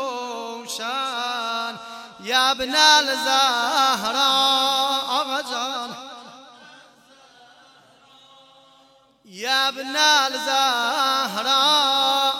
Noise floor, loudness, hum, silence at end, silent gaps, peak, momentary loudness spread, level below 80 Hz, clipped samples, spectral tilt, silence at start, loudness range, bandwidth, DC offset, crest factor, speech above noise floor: -56 dBFS; -19 LUFS; none; 0 s; none; -2 dBFS; 15 LU; -66 dBFS; under 0.1%; 0 dB/octave; 0 s; 12 LU; 17 kHz; under 0.1%; 20 dB; 35 dB